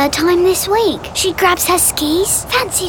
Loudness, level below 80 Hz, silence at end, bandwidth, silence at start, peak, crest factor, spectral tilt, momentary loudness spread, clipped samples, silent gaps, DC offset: -13 LUFS; -38 dBFS; 0 s; over 20 kHz; 0 s; -2 dBFS; 12 dB; -2.5 dB/octave; 4 LU; under 0.1%; none; 0.2%